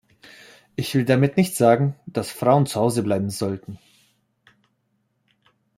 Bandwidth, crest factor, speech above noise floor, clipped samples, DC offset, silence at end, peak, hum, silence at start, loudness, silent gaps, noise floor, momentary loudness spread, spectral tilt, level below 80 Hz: 16 kHz; 20 dB; 50 dB; under 0.1%; under 0.1%; 2 s; -2 dBFS; none; 0.8 s; -21 LUFS; none; -70 dBFS; 12 LU; -6 dB/octave; -62 dBFS